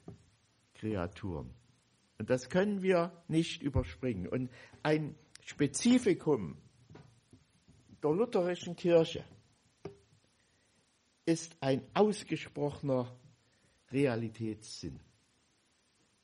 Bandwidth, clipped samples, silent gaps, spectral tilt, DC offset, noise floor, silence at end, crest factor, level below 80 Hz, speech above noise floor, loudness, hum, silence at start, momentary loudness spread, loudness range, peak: 11.5 kHz; under 0.1%; none; -6 dB/octave; under 0.1%; -73 dBFS; 1.25 s; 20 dB; -58 dBFS; 40 dB; -34 LUFS; none; 0.1 s; 16 LU; 3 LU; -14 dBFS